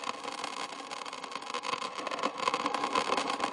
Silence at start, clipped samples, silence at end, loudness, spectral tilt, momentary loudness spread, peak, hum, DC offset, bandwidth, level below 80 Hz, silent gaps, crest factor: 0 s; under 0.1%; 0 s; -34 LUFS; -1.5 dB/octave; 9 LU; -10 dBFS; none; under 0.1%; 11.5 kHz; -76 dBFS; none; 24 dB